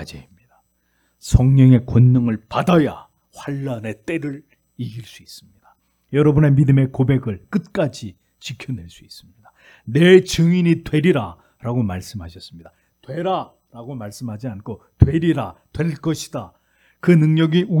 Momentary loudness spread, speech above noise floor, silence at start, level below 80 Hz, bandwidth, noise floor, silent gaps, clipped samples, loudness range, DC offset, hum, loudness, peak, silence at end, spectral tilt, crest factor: 22 LU; 48 dB; 0 s; -38 dBFS; 13 kHz; -65 dBFS; none; under 0.1%; 8 LU; under 0.1%; none; -17 LUFS; 0 dBFS; 0 s; -7.5 dB/octave; 18 dB